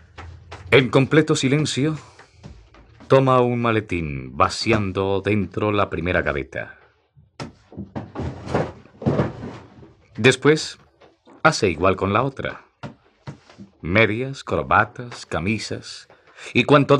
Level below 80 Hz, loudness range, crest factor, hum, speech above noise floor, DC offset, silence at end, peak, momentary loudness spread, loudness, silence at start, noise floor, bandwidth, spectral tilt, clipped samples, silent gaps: -48 dBFS; 7 LU; 20 dB; none; 37 dB; under 0.1%; 0 s; -2 dBFS; 23 LU; -20 LUFS; 0.2 s; -56 dBFS; 11 kHz; -5.5 dB/octave; under 0.1%; none